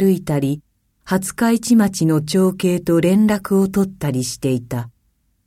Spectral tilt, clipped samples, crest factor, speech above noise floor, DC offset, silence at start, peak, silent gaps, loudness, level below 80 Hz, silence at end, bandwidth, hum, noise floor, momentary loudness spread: -6 dB/octave; under 0.1%; 14 dB; 47 dB; under 0.1%; 0 s; -4 dBFS; none; -18 LUFS; -50 dBFS; 0.55 s; 16 kHz; none; -64 dBFS; 9 LU